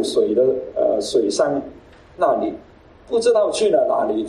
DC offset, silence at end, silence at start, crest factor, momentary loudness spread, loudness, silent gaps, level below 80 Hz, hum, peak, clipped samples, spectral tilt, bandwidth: under 0.1%; 0 s; 0 s; 14 dB; 9 LU; -19 LUFS; none; -54 dBFS; none; -4 dBFS; under 0.1%; -4 dB/octave; 12 kHz